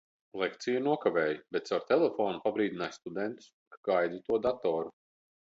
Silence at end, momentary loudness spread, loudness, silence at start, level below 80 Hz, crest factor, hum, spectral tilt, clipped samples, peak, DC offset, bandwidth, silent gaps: 0.55 s; 10 LU; -32 LUFS; 0.35 s; -72 dBFS; 20 dB; none; -5.5 dB/octave; under 0.1%; -12 dBFS; under 0.1%; 7.8 kHz; 3.53-3.71 s, 3.77-3.83 s